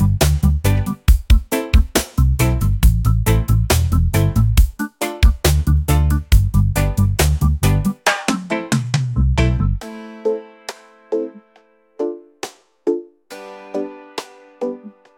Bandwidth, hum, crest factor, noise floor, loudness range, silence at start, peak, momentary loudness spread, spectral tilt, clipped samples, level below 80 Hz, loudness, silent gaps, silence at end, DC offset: 17 kHz; none; 16 dB; -54 dBFS; 11 LU; 0 s; 0 dBFS; 15 LU; -5.5 dB/octave; under 0.1%; -20 dBFS; -18 LUFS; none; 0.25 s; under 0.1%